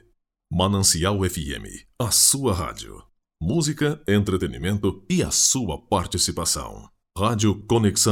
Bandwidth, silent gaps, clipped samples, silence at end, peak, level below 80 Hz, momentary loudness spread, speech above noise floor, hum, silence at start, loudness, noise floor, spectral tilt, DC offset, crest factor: 18.5 kHz; none; under 0.1%; 0 s; -2 dBFS; -42 dBFS; 14 LU; 42 dB; none; 0.5 s; -21 LUFS; -65 dBFS; -3.5 dB/octave; under 0.1%; 20 dB